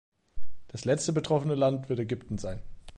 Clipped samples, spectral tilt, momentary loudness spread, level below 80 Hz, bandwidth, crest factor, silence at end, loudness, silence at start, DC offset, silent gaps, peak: under 0.1%; -6 dB/octave; 12 LU; -50 dBFS; 11 kHz; 14 dB; 0 s; -30 LUFS; 0.1 s; under 0.1%; none; -14 dBFS